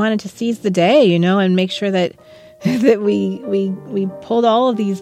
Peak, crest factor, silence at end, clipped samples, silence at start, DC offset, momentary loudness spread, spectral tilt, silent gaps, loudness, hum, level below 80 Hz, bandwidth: -2 dBFS; 14 dB; 0 s; under 0.1%; 0 s; under 0.1%; 10 LU; -6.5 dB/octave; none; -16 LUFS; none; -64 dBFS; 13 kHz